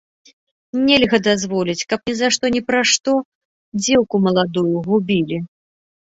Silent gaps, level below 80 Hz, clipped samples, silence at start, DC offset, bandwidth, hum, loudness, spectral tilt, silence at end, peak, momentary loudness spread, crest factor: 3.25-3.72 s; -54 dBFS; under 0.1%; 0.75 s; under 0.1%; 8 kHz; none; -17 LUFS; -4 dB/octave; 0.65 s; -2 dBFS; 9 LU; 18 dB